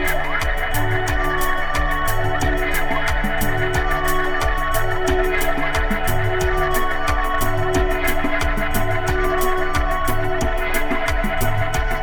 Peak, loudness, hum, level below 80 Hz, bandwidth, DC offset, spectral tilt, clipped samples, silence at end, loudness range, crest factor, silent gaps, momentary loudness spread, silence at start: -4 dBFS; -21 LUFS; none; -22 dBFS; 19.5 kHz; under 0.1%; -4.5 dB/octave; under 0.1%; 0 s; 1 LU; 14 dB; none; 2 LU; 0 s